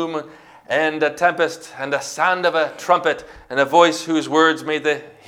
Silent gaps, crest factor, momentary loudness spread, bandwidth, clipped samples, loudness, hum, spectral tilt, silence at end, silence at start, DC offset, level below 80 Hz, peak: none; 20 dB; 10 LU; 16 kHz; under 0.1%; -19 LUFS; none; -3.5 dB/octave; 0.15 s; 0 s; under 0.1%; -60 dBFS; 0 dBFS